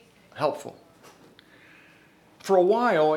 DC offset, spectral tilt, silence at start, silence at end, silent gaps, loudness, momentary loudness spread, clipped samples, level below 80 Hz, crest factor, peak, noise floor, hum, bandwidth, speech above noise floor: under 0.1%; -5.5 dB/octave; 0.35 s; 0 s; none; -23 LUFS; 22 LU; under 0.1%; -76 dBFS; 18 dB; -8 dBFS; -56 dBFS; none; 16 kHz; 34 dB